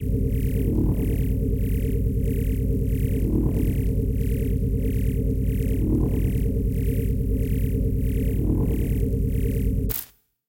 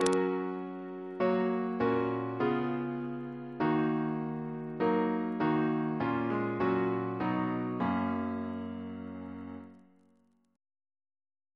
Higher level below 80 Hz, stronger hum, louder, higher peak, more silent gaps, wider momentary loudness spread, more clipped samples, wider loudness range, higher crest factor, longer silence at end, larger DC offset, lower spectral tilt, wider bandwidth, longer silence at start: first, -26 dBFS vs -68 dBFS; neither; first, -25 LUFS vs -32 LUFS; about the same, -10 dBFS vs -8 dBFS; neither; second, 2 LU vs 12 LU; neither; second, 0 LU vs 6 LU; second, 14 dB vs 24 dB; second, 0.45 s vs 1.75 s; neither; first, -8.5 dB/octave vs -7 dB/octave; first, 17 kHz vs 11 kHz; about the same, 0 s vs 0 s